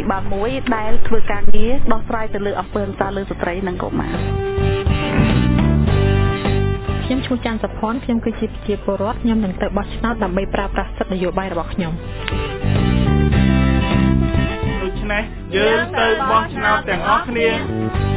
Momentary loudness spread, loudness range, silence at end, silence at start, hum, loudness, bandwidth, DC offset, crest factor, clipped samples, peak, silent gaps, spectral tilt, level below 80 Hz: 7 LU; 5 LU; 0 s; 0 s; none; -19 LUFS; 4 kHz; under 0.1%; 16 dB; under 0.1%; 0 dBFS; none; -10.5 dB/octave; -26 dBFS